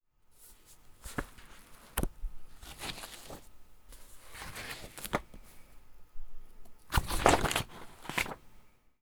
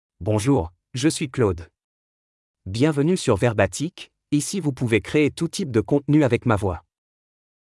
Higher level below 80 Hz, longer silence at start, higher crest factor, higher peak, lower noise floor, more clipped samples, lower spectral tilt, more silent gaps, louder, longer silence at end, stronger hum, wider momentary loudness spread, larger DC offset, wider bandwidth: first, -44 dBFS vs -50 dBFS; about the same, 0.3 s vs 0.2 s; first, 34 dB vs 18 dB; about the same, -4 dBFS vs -4 dBFS; second, -60 dBFS vs under -90 dBFS; neither; second, -3.5 dB/octave vs -6 dB/octave; second, none vs 1.84-2.54 s; second, -35 LUFS vs -22 LUFS; second, 0.35 s vs 0.9 s; neither; first, 28 LU vs 12 LU; neither; first, over 20 kHz vs 12 kHz